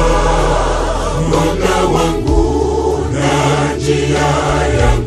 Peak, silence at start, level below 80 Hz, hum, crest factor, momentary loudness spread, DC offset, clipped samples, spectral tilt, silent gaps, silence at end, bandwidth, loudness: 0 dBFS; 0 s; -20 dBFS; none; 12 dB; 3 LU; under 0.1%; under 0.1%; -5.5 dB/octave; none; 0 s; 13.5 kHz; -14 LUFS